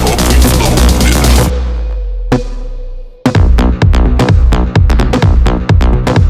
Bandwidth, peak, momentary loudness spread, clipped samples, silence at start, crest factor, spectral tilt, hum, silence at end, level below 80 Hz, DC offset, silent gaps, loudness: 15.5 kHz; 0 dBFS; 11 LU; under 0.1%; 0 s; 8 dB; -5.5 dB/octave; none; 0 s; -10 dBFS; under 0.1%; none; -10 LUFS